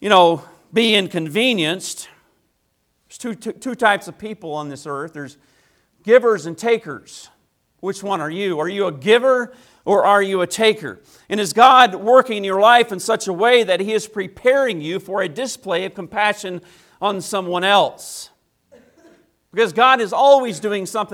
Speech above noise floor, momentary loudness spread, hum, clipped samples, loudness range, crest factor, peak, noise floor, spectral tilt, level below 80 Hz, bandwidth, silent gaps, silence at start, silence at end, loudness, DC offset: 50 dB; 17 LU; none; under 0.1%; 8 LU; 18 dB; 0 dBFS; -67 dBFS; -3.5 dB/octave; -66 dBFS; 16.5 kHz; none; 0 s; 0 s; -17 LUFS; under 0.1%